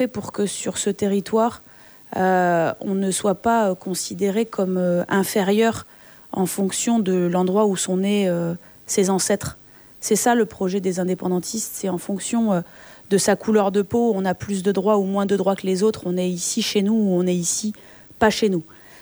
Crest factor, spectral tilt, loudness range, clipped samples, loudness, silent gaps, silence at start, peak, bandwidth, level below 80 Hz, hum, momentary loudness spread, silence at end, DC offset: 18 dB; -4.5 dB/octave; 2 LU; under 0.1%; -21 LUFS; none; 0 s; -4 dBFS; over 20 kHz; -58 dBFS; none; 7 LU; 0 s; under 0.1%